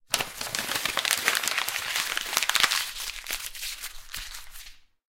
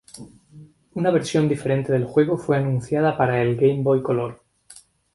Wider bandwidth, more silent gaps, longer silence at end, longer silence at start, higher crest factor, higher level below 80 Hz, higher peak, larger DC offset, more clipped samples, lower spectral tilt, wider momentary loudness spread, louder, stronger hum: first, 17 kHz vs 11.5 kHz; neither; second, 0.25 s vs 0.4 s; about the same, 0.1 s vs 0.15 s; first, 26 dB vs 16 dB; about the same, -52 dBFS vs -56 dBFS; about the same, -4 dBFS vs -4 dBFS; neither; neither; second, 1 dB/octave vs -7.5 dB/octave; first, 15 LU vs 8 LU; second, -26 LUFS vs -21 LUFS; neither